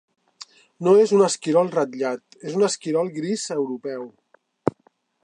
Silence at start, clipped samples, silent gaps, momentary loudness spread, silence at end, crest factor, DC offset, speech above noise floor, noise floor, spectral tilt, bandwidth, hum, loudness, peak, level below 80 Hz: 0.8 s; under 0.1%; none; 22 LU; 0.55 s; 20 dB; under 0.1%; 42 dB; -63 dBFS; -5 dB/octave; 10.5 kHz; none; -22 LUFS; -4 dBFS; -70 dBFS